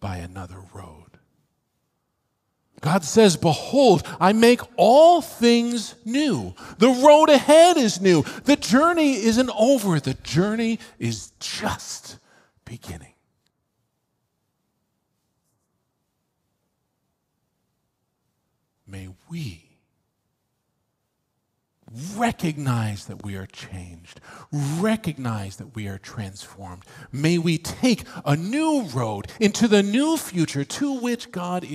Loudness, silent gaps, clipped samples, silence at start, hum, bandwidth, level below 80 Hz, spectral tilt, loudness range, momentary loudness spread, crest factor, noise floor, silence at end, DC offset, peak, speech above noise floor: -20 LUFS; none; under 0.1%; 0 s; none; 15.5 kHz; -58 dBFS; -5 dB/octave; 25 LU; 22 LU; 22 dB; -75 dBFS; 0 s; under 0.1%; -2 dBFS; 55 dB